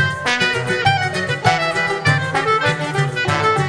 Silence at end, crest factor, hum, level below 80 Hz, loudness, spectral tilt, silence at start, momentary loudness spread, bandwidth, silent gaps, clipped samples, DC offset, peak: 0 s; 16 dB; none; -50 dBFS; -17 LUFS; -4.5 dB/octave; 0 s; 3 LU; 11 kHz; none; under 0.1%; under 0.1%; -2 dBFS